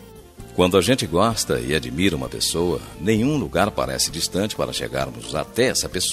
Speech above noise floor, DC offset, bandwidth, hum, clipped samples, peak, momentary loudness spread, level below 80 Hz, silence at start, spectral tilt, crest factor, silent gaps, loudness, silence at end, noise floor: 20 dB; under 0.1%; 15 kHz; none; under 0.1%; -2 dBFS; 8 LU; -42 dBFS; 0 s; -4 dB/octave; 20 dB; none; -21 LUFS; 0 s; -41 dBFS